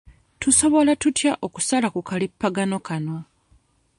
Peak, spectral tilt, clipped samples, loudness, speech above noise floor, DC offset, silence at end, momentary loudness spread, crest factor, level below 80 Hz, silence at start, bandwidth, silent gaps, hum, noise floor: -4 dBFS; -3.5 dB/octave; under 0.1%; -21 LUFS; 39 dB; under 0.1%; 0.75 s; 12 LU; 18 dB; -54 dBFS; 0.05 s; 11.5 kHz; none; none; -60 dBFS